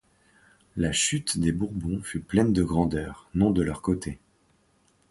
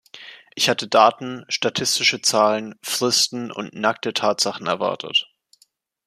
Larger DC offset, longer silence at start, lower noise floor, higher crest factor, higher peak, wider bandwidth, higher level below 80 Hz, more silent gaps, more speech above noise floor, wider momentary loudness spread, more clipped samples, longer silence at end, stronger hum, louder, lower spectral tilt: neither; first, 0.75 s vs 0.15 s; about the same, -65 dBFS vs -62 dBFS; about the same, 20 dB vs 20 dB; second, -8 dBFS vs -2 dBFS; second, 11.5 kHz vs 15 kHz; first, -44 dBFS vs -70 dBFS; neither; about the same, 40 dB vs 41 dB; second, 9 LU vs 13 LU; neither; about the same, 0.95 s vs 0.85 s; neither; second, -26 LUFS vs -20 LUFS; first, -5 dB/octave vs -2 dB/octave